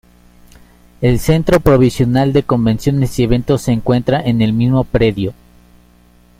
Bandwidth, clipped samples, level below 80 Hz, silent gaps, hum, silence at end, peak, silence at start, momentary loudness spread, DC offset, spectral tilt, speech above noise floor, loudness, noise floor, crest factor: 16.5 kHz; under 0.1%; -30 dBFS; none; 60 Hz at -30 dBFS; 1.05 s; 0 dBFS; 1 s; 4 LU; under 0.1%; -7.5 dB/octave; 35 dB; -14 LUFS; -47 dBFS; 14 dB